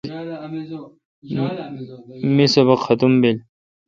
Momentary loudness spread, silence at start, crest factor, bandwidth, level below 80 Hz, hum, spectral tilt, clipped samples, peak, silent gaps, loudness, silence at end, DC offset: 19 LU; 0.05 s; 20 dB; 7.6 kHz; -60 dBFS; none; -6.5 dB/octave; under 0.1%; 0 dBFS; 1.05-1.22 s; -18 LUFS; 0.5 s; under 0.1%